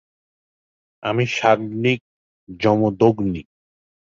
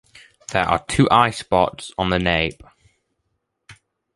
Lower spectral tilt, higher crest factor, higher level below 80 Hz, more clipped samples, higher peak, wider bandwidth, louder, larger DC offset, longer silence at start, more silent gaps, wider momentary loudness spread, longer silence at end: first, -6.5 dB/octave vs -5 dB/octave; about the same, 20 dB vs 20 dB; second, -52 dBFS vs -42 dBFS; neither; about the same, -2 dBFS vs -2 dBFS; second, 7.6 kHz vs 11.5 kHz; about the same, -20 LUFS vs -19 LUFS; neither; first, 1 s vs 0.5 s; first, 2.01-2.47 s vs none; about the same, 9 LU vs 10 LU; first, 0.75 s vs 0.45 s